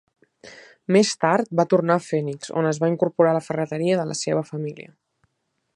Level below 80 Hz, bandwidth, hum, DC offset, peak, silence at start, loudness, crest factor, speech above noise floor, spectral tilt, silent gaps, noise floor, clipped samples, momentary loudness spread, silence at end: -70 dBFS; 11.5 kHz; none; under 0.1%; -4 dBFS; 0.45 s; -22 LUFS; 20 dB; 53 dB; -5.5 dB/octave; none; -74 dBFS; under 0.1%; 11 LU; 0.95 s